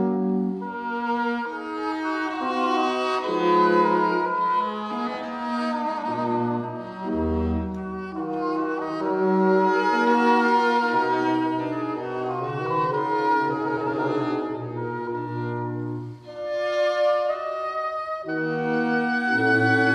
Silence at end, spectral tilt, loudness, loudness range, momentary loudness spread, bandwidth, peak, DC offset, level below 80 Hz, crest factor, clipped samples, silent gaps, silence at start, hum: 0 s; -7 dB/octave; -24 LUFS; 6 LU; 10 LU; 10.5 kHz; -8 dBFS; under 0.1%; -48 dBFS; 16 dB; under 0.1%; none; 0 s; none